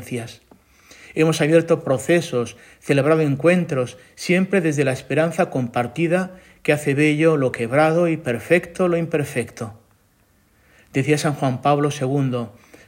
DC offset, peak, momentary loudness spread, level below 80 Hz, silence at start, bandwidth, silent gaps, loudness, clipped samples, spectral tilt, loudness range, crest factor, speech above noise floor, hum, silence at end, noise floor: under 0.1%; -2 dBFS; 13 LU; -60 dBFS; 0 s; 16.5 kHz; none; -20 LUFS; under 0.1%; -6 dB/octave; 4 LU; 18 dB; 40 dB; none; 0.35 s; -59 dBFS